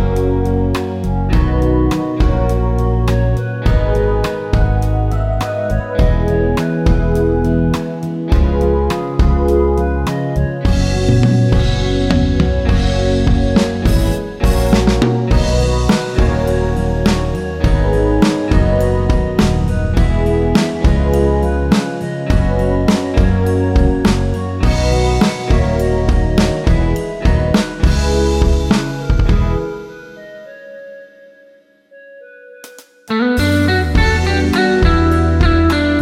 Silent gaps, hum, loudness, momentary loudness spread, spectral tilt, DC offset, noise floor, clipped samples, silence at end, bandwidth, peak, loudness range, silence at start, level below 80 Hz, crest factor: none; none; -15 LUFS; 5 LU; -7 dB/octave; under 0.1%; -48 dBFS; under 0.1%; 0 s; 14.5 kHz; 0 dBFS; 3 LU; 0 s; -18 dBFS; 14 dB